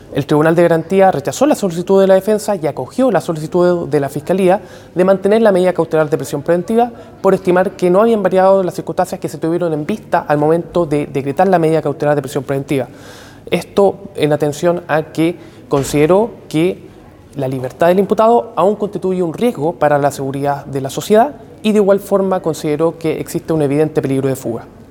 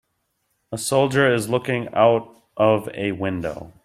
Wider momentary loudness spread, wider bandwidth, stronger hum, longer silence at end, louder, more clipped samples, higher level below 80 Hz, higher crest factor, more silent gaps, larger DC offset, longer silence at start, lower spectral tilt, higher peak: about the same, 9 LU vs 11 LU; first, 18 kHz vs 15.5 kHz; neither; about the same, 0.1 s vs 0.15 s; first, -15 LUFS vs -21 LUFS; neither; first, -48 dBFS vs -56 dBFS; second, 14 dB vs 20 dB; neither; neither; second, 0.1 s vs 0.7 s; first, -6.5 dB/octave vs -5 dB/octave; about the same, 0 dBFS vs -2 dBFS